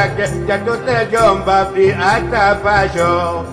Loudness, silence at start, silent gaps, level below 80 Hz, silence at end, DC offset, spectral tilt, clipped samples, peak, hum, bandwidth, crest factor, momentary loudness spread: -14 LUFS; 0 s; none; -34 dBFS; 0 s; under 0.1%; -5.5 dB/octave; under 0.1%; 0 dBFS; none; 13.5 kHz; 14 dB; 5 LU